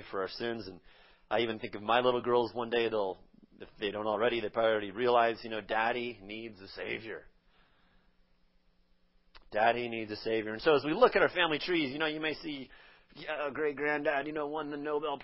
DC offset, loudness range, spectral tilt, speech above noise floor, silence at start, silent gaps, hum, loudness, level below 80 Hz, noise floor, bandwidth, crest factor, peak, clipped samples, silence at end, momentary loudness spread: under 0.1%; 8 LU; -8 dB/octave; 36 dB; 0 s; none; none; -32 LUFS; -64 dBFS; -68 dBFS; 5.8 kHz; 24 dB; -10 dBFS; under 0.1%; 0 s; 15 LU